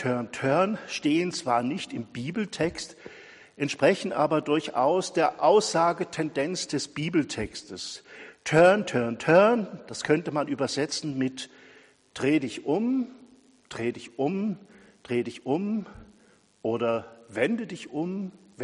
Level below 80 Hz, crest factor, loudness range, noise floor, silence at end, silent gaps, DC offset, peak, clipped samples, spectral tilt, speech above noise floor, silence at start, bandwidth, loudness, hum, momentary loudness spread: -62 dBFS; 20 dB; 7 LU; -60 dBFS; 0 s; none; under 0.1%; -6 dBFS; under 0.1%; -5 dB/octave; 34 dB; 0 s; 11 kHz; -27 LUFS; none; 16 LU